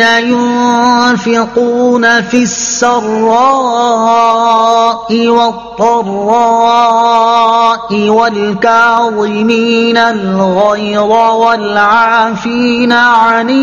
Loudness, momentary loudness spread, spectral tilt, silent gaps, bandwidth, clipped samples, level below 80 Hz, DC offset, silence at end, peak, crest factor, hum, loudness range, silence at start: -9 LUFS; 4 LU; -4 dB/octave; none; 7.4 kHz; 0.5%; -48 dBFS; 0.3%; 0 s; 0 dBFS; 8 dB; none; 1 LU; 0 s